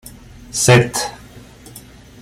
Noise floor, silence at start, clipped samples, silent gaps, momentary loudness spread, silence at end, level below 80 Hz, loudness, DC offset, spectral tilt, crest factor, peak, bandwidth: -40 dBFS; 0.05 s; under 0.1%; none; 26 LU; 0.4 s; -44 dBFS; -15 LUFS; under 0.1%; -4 dB/octave; 18 dB; 0 dBFS; 15.5 kHz